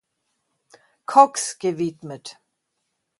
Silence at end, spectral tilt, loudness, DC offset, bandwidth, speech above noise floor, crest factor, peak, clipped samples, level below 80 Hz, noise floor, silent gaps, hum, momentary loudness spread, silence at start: 0.9 s; -4 dB/octave; -20 LUFS; under 0.1%; 11.5 kHz; 56 dB; 24 dB; 0 dBFS; under 0.1%; -74 dBFS; -76 dBFS; none; none; 22 LU; 1.1 s